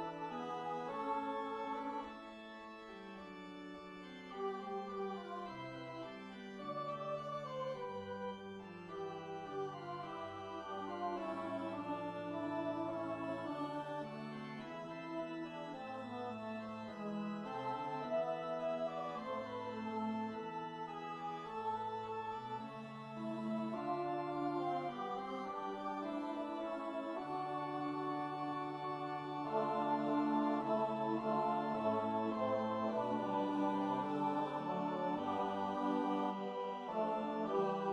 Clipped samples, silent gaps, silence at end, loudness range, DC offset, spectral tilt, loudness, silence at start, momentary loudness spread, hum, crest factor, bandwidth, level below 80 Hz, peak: under 0.1%; none; 0 s; 8 LU; under 0.1%; -7 dB/octave; -41 LUFS; 0 s; 10 LU; none; 16 dB; 10.5 kHz; -76 dBFS; -24 dBFS